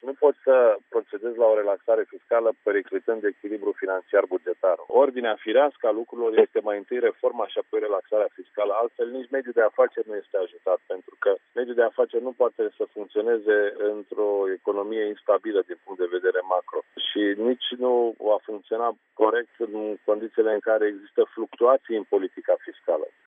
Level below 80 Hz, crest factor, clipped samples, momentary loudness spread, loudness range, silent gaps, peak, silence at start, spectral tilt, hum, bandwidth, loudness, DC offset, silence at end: under -90 dBFS; 18 dB; under 0.1%; 8 LU; 3 LU; none; -6 dBFS; 0.05 s; -0.5 dB/octave; none; 3.8 kHz; -25 LUFS; under 0.1%; 0.2 s